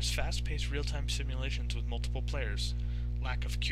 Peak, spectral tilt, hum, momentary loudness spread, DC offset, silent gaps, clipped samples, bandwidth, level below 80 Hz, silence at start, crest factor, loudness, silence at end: -18 dBFS; -4 dB/octave; 60 Hz at -35 dBFS; 2 LU; 0.3%; none; under 0.1%; 13.5 kHz; -34 dBFS; 0 s; 14 dB; -35 LUFS; 0 s